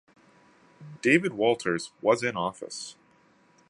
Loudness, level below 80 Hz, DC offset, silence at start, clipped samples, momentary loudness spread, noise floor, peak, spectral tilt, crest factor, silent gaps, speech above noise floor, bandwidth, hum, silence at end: -26 LUFS; -70 dBFS; under 0.1%; 0.8 s; under 0.1%; 15 LU; -62 dBFS; -6 dBFS; -4.5 dB/octave; 22 dB; none; 35 dB; 11.5 kHz; none; 0.8 s